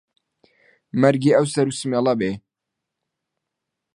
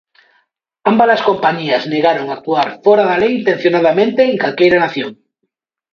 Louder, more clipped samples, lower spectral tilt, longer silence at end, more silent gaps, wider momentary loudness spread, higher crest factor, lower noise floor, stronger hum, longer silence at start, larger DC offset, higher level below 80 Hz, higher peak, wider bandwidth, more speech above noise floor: second, -20 LUFS vs -13 LUFS; neither; about the same, -6 dB/octave vs -6.5 dB/octave; first, 1.55 s vs 0.8 s; neither; first, 10 LU vs 7 LU; first, 22 dB vs 14 dB; first, -83 dBFS vs -72 dBFS; neither; about the same, 0.95 s vs 0.85 s; neither; second, -62 dBFS vs -56 dBFS; about the same, -2 dBFS vs 0 dBFS; first, 11.5 kHz vs 6.8 kHz; first, 64 dB vs 59 dB